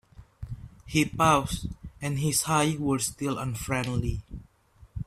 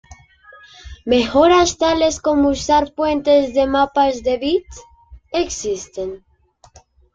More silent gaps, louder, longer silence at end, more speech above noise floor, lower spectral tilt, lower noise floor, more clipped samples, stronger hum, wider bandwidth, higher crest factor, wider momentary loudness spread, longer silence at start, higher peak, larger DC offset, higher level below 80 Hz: neither; second, -27 LUFS vs -17 LUFS; second, 0.05 s vs 1 s; about the same, 30 dB vs 33 dB; about the same, -4.5 dB/octave vs -3.5 dB/octave; first, -56 dBFS vs -50 dBFS; neither; neither; first, 16 kHz vs 9.4 kHz; about the same, 20 dB vs 16 dB; first, 20 LU vs 12 LU; about the same, 0.2 s vs 0.1 s; second, -8 dBFS vs -2 dBFS; neither; about the same, -44 dBFS vs -42 dBFS